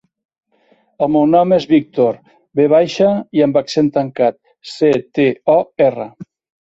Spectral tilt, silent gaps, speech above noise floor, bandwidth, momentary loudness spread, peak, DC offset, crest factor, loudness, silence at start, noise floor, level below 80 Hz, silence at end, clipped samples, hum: -7 dB/octave; none; 43 dB; 8 kHz; 8 LU; -2 dBFS; under 0.1%; 14 dB; -15 LUFS; 1 s; -56 dBFS; -58 dBFS; 0.4 s; under 0.1%; none